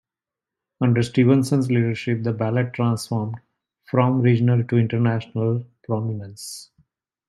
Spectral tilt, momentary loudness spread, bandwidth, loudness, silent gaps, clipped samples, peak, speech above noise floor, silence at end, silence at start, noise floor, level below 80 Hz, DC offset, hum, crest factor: -7.5 dB/octave; 14 LU; 12.5 kHz; -21 LUFS; none; under 0.1%; -2 dBFS; 68 dB; 0.65 s; 0.8 s; -89 dBFS; -62 dBFS; under 0.1%; none; 18 dB